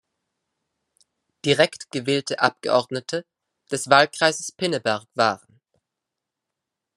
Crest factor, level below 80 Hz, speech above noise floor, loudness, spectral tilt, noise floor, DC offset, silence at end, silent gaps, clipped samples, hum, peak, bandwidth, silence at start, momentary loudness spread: 24 dB; -68 dBFS; 63 dB; -22 LUFS; -3.5 dB/octave; -84 dBFS; under 0.1%; 1.6 s; none; under 0.1%; none; 0 dBFS; 13 kHz; 1.45 s; 12 LU